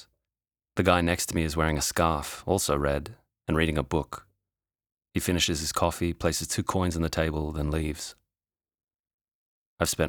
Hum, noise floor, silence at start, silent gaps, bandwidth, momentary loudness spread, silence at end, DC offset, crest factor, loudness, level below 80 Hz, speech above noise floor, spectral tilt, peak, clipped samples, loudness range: none; under -90 dBFS; 0.75 s; 4.92-4.97 s, 9.00-9.04 s, 9.14-9.19 s, 9.34-9.77 s; over 20 kHz; 10 LU; 0 s; under 0.1%; 22 dB; -27 LUFS; -44 dBFS; over 63 dB; -4.5 dB/octave; -6 dBFS; under 0.1%; 4 LU